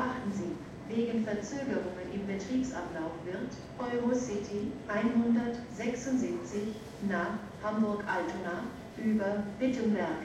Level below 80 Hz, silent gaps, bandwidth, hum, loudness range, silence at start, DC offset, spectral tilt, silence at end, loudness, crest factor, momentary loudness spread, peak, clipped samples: -60 dBFS; none; 11 kHz; none; 3 LU; 0 s; under 0.1%; -6 dB/octave; 0 s; -34 LUFS; 16 dB; 8 LU; -18 dBFS; under 0.1%